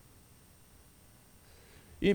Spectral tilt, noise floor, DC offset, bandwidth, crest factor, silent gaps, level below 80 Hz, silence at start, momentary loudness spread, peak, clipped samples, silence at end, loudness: -6.5 dB/octave; -60 dBFS; under 0.1%; over 20 kHz; 22 dB; none; -56 dBFS; 2 s; 6 LU; -16 dBFS; under 0.1%; 0 s; -33 LUFS